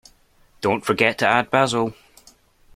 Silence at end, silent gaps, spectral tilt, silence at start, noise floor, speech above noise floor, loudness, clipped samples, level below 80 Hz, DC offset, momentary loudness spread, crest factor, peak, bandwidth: 0.85 s; none; -4.5 dB/octave; 0.6 s; -56 dBFS; 37 dB; -20 LUFS; under 0.1%; -58 dBFS; under 0.1%; 8 LU; 20 dB; -2 dBFS; 16 kHz